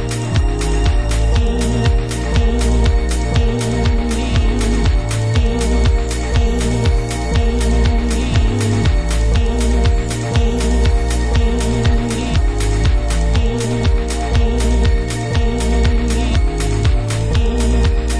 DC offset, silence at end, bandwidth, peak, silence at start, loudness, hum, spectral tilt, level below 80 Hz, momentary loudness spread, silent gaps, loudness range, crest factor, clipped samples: under 0.1%; 0 s; 11 kHz; -2 dBFS; 0 s; -17 LUFS; none; -5.5 dB/octave; -16 dBFS; 2 LU; none; 1 LU; 12 dB; under 0.1%